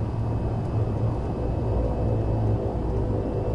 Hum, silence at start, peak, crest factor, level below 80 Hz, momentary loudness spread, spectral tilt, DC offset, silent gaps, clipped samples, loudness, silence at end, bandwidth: none; 0 s; -14 dBFS; 10 dB; -32 dBFS; 3 LU; -10 dB/octave; under 0.1%; none; under 0.1%; -26 LUFS; 0 s; 5.6 kHz